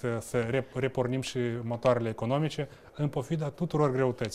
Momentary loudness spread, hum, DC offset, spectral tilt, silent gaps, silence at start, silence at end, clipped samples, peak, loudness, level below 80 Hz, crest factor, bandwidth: 6 LU; none; under 0.1%; -6.5 dB/octave; none; 0 s; 0 s; under 0.1%; -10 dBFS; -30 LUFS; -56 dBFS; 18 dB; 14.5 kHz